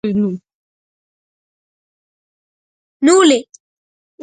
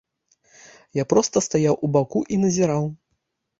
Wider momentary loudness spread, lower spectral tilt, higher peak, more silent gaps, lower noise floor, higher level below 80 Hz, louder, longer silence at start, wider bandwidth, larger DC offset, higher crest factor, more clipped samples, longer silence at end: first, 11 LU vs 8 LU; second, -4 dB/octave vs -6 dB/octave; first, 0 dBFS vs -4 dBFS; first, 0.54-3.00 s vs none; first, under -90 dBFS vs -75 dBFS; about the same, -62 dBFS vs -58 dBFS; first, -14 LUFS vs -21 LUFS; second, 0.05 s vs 0.95 s; first, 9.4 kHz vs 8 kHz; neither; about the same, 18 dB vs 20 dB; neither; first, 0.8 s vs 0.65 s